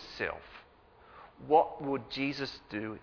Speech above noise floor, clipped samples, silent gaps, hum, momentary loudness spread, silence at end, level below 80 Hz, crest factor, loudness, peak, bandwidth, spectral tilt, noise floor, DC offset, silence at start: 27 dB; under 0.1%; none; none; 23 LU; 0 s; -64 dBFS; 22 dB; -32 LUFS; -12 dBFS; 5.4 kHz; -6 dB/octave; -59 dBFS; under 0.1%; 0 s